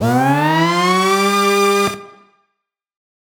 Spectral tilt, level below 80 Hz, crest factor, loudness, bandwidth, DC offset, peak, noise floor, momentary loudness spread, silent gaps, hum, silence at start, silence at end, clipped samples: -4.5 dB/octave; -60 dBFS; 12 dB; -14 LUFS; over 20 kHz; under 0.1%; -4 dBFS; -76 dBFS; 4 LU; none; none; 0 s; 1.2 s; under 0.1%